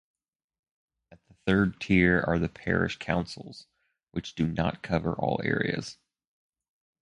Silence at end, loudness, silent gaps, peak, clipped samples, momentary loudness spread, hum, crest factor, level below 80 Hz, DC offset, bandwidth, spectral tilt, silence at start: 1.1 s; -28 LUFS; 4.03-4.07 s; -8 dBFS; under 0.1%; 15 LU; none; 22 dB; -48 dBFS; under 0.1%; 10.5 kHz; -7 dB/octave; 1.1 s